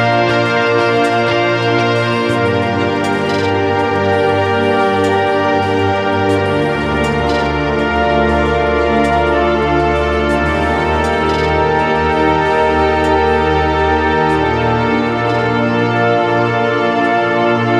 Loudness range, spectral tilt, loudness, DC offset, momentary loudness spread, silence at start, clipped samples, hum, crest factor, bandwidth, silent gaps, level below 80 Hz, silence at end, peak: 1 LU; -6.5 dB/octave; -14 LUFS; under 0.1%; 2 LU; 0 s; under 0.1%; none; 12 dB; 12 kHz; none; -30 dBFS; 0 s; 0 dBFS